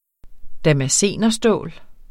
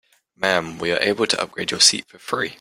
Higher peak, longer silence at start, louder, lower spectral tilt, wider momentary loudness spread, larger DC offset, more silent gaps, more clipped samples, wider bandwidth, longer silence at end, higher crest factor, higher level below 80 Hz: second, -4 dBFS vs 0 dBFS; second, 0.25 s vs 0.4 s; about the same, -18 LUFS vs -19 LUFS; first, -4 dB/octave vs -1.5 dB/octave; second, 7 LU vs 11 LU; neither; neither; neither; about the same, 15.5 kHz vs 16.5 kHz; about the same, 0.05 s vs 0.05 s; second, 16 dB vs 22 dB; first, -42 dBFS vs -60 dBFS